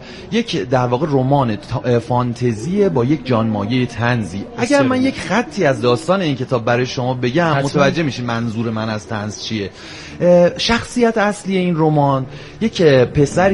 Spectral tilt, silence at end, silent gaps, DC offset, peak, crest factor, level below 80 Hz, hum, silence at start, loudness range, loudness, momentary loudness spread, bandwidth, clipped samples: -6 dB/octave; 0 s; none; under 0.1%; 0 dBFS; 16 dB; -44 dBFS; none; 0 s; 3 LU; -17 LUFS; 9 LU; 11.5 kHz; under 0.1%